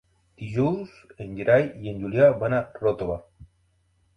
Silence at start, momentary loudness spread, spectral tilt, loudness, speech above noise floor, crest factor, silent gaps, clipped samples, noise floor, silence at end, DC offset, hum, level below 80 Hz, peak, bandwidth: 0.4 s; 18 LU; -9 dB/octave; -24 LUFS; 43 dB; 20 dB; none; under 0.1%; -66 dBFS; 0.7 s; under 0.1%; none; -52 dBFS; -6 dBFS; 6.4 kHz